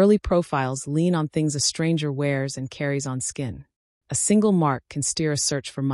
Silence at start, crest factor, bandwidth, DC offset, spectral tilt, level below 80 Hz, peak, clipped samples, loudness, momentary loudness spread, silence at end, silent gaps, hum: 0 s; 16 dB; 13 kHz; under 0.1%; -5 dB/octave; -46 dBFS; -8 dBFS; under 0.1%; -23 LUFS; 9 LU; 0 s; 3.76-4.01 s; none